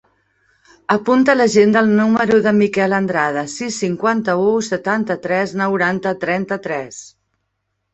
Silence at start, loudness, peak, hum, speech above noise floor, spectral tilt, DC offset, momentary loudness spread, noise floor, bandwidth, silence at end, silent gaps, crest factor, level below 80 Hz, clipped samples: 0.9 s; -16 LUFS; 0 dBFS; none; 56 dB; -5.5 dB/octave; under 0.1%; 10 LU; -72 dBFS; 8.2 kHz; 0.85 s; none; 16 dB; -58 dBFS; under 0.1%